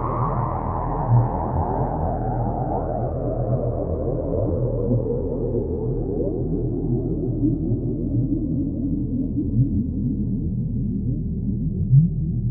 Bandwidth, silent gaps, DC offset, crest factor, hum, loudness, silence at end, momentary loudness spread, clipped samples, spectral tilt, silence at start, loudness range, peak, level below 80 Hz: 2.3 kHz; none; under 0.1%; 18 dB; none; -23 LUFS; 0 s; 5 LU; under 0.1%; -16 dB/octave; 0 s; 2 LU; -4 dBFS; -32 dBFS